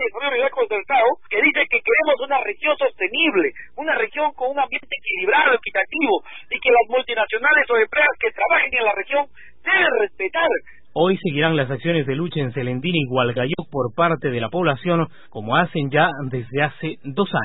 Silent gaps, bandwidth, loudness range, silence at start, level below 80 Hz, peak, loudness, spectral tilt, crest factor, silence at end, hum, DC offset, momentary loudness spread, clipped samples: none; 4.1 kHz; 3 LU; 0 s; -56 dBFS; -4 dBFS; -19 LUFS; -10.5 dB/octave; 16 dB; 0 s; none; 1%; 8 LU; under 0.1%